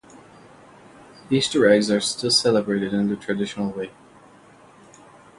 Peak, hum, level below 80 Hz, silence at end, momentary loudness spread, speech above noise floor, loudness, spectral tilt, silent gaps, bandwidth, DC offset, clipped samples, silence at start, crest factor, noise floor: -2 dBFS; none; -60 dBFS; 1.5 s; 11 LU; 29 dB; -21 LUFS; -4 dB/octave; none; 11.5 kHz; under 0.1%; under 0.1%; 0.15 s; 20 dB; -50 dBFS